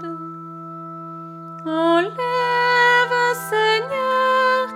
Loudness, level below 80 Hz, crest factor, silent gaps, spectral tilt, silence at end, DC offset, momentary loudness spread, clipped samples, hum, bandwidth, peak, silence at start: -18 LUFS; -72 dBFS; 14 dB; none; -4 dB/octave; 0 s; under 0.1%; 19 LU; under 0.1%; none; 16.5 kHz; -6 dBFS; 0 s